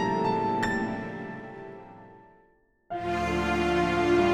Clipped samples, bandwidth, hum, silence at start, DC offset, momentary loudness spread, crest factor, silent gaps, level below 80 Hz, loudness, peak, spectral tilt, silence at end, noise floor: under 0.1%; 12 kHz; none; 0 s; under 0.1%; 18 LU; 16 dB; none; -46 dBFS; -28 LUFS; -12 dBFS; -6 dB/octave; 0 s; -64 dBFS